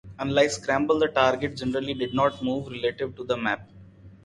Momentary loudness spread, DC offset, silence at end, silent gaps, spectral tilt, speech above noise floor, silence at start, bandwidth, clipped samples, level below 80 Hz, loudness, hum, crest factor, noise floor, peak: 7 LU; under 0.1%; 0.15 s; none; -5 dB/octave; 23 dB; 0.05 s; 11.5 kHz; under 0.1%; -54 dBFS; -25 LUFS; none; 20 dB; -48 dBFS; -6 dBFS